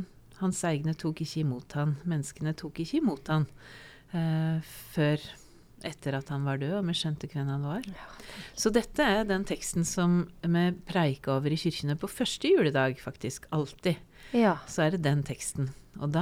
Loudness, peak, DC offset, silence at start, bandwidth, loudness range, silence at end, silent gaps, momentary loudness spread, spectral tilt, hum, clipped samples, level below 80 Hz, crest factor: -30 LUFS; -10 dBFS; under 0.1%; 0 s; 16 kHz; 4 LU; 0 s; none; 11 LU; -5.5 dB/octave; none; under 0.1%; -54 dBFS; 20 dB